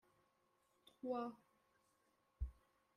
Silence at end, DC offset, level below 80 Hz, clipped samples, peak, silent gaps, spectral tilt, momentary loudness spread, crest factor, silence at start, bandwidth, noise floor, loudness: 0.45 s; under 0.1%; -58 dBFS; under 0.1%; -32 dBFS; none; -8.5 dB/octave; 7 LU; 20 dB; 1.05 s; 13 kHz; -81 dBFS; -49 LUFS